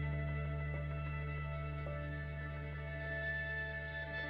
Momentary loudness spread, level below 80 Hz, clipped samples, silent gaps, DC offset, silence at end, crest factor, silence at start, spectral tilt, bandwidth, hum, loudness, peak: 5 LU; -46 dBFS; under 0.1%; none; under 0.1%; 0 s; 12 dB; 0 s; -9 dB/octave; 5.2 kHz; none; -42 LUFS; -30 dBFS